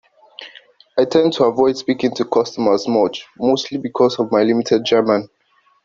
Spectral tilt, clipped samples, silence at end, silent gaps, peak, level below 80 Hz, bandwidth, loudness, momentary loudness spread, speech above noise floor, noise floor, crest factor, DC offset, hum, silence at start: -5.5 dB/octave; under 0.1%; 0.6 s; none; 0 dBFS; -60 dBFS; 7.6 kHz; -17 LUFS; 9 LU; 30 dB; -46 dBFS; 18 dB; under 0.1%; none; 0.4 s